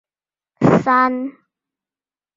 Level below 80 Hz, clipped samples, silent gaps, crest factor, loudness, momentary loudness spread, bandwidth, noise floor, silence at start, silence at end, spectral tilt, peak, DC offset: -54 dBFS; under 0.1%; none; 18 dB; -16 LUFS; 13 LU; 7.6 kHz; under -90 dBFS; 0.6 s; 1.05 s; -8 dB/octave; -2 dBFS; under 0.1%